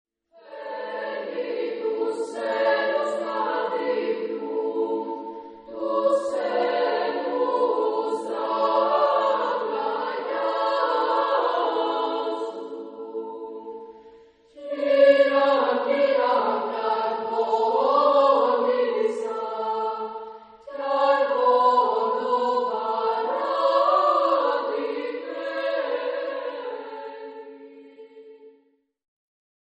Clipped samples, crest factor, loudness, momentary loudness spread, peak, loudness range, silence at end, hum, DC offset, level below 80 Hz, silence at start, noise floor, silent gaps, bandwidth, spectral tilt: under 0.1%; 18 dB; -23 LUFS; 16 LU; -6 dBFS; 8 LU; 1.25 s; none; under 0.1%; -78 dBFS; 0.45 s; -64 dBFS; none; 9.6 kHz; -4 dB/octave